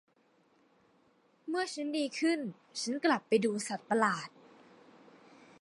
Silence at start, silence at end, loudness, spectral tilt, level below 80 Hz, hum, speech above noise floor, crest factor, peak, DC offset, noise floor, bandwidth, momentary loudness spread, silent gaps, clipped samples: 1.45 s; 1.35 s; -33 LUFS; -4 dB/octave; -86 dBFS; none; 37 dB; 22 dB; -14 dBFS; under 0.1%; -70 dBFS; 11.5 kHz; 9 LU; none; under 0.1%